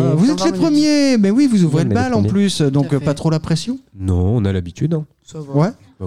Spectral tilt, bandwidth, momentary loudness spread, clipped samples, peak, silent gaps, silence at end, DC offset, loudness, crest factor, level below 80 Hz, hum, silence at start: -6.5 dB/octave; 12.5 kHz; 8 LU; under 0.1%; -4 dBFS; none; 0 s; 0.6%; -16 LUFS; 10 dB; -42 dBFS; none; 0 s